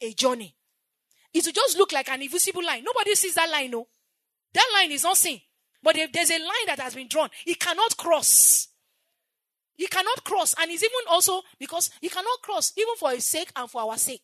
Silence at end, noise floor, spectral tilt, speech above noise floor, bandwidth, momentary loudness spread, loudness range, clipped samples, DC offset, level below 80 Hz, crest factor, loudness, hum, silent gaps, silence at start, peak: 0.05 s; -85 dBFS; 0.5 dB/octave; 61 dB; 13.5 kHz; 11 LU; 4 LU; under 0.1%; under 0.1%; -88 dBFS; 22 dB; -22 LUFS; none; none; 0 s; -4 dBFS